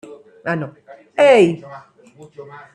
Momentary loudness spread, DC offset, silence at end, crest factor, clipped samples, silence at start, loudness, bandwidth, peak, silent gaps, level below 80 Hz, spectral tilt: 26 LU; under 0.1%; 0.15 s; 16 dB; under 0.1%; 0.1 s; -15 LUFS; 11 kHz; -2 dBFS; none; -66 dBFS; -6 dB/octave